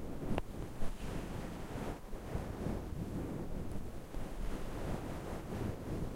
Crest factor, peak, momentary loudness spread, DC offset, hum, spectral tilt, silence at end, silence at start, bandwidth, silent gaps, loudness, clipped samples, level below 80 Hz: 22 dB; -18 dBFS; 5 LU; under 0.1%; none; -6.5 dB/octave; 0 s; 0 s; 16 kHz; none; -43 LUFS; under 0.1%; -44 dBFS